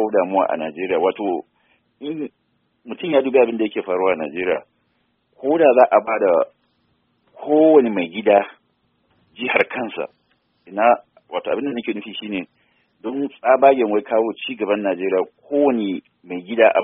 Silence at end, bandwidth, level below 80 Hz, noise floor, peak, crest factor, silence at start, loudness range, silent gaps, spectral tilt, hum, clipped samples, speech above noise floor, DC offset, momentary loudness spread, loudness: 0 s; 3.8 kHz; -68 dBFS; -67 dBFS; 0 dBFS; 20 dB; 0 s; 6 LU; none; -3 dB/octave; none; under 0.1%; 48 dB; under 0.1%; 16 LU; -19 LUFS